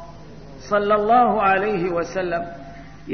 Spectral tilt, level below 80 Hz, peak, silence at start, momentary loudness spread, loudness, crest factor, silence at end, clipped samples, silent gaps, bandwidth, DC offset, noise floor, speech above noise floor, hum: -6 dB/octave; -48 dBFS; -4 dBFS; 0 s; 24 LU; -20 LUFS; 16 dB; 0 s; under 0.1%; none; 6.6 kHz; 0.6%; -40 dBFS; 21 dB; none